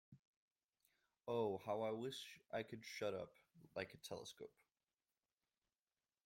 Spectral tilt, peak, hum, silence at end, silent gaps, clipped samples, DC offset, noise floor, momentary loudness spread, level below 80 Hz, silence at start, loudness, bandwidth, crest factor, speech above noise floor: -4.5 dB/octave; -28 dBFS; none; 1.8 s; 0.19-0.56 s, 0.64-0.69 s; under 0.1%; under 0.1%; under -90 dBFS; 14 LU; -86 dBFS; 0.1 s; -48 LUFS; 16.5 kHz; 22 dB; over 43 dB